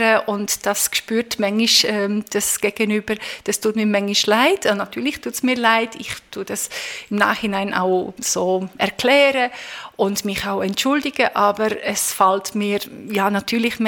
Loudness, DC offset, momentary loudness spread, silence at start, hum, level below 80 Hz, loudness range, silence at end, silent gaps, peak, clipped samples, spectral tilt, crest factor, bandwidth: -19 LUFS; under 0.1%; 10 LU; 0 s; none; -56 dBFS; 2 LU; 0 s; none; 0 dBFS; under 0.1%; -2.5 dB/octave; 20 dB; 18 kHz